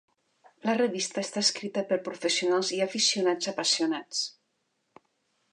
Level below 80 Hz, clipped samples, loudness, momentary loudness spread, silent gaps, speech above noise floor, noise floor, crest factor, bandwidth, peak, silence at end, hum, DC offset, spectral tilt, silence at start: -84 dBFS; under 0.1%; -27 LUFS; 7 LU; none; 48 dB; -76 dBFS; 20 dB; 11 kHz; -10 dBFS; 1.2 s; none; under 0.1%; -2 dB/octave; 0.65 s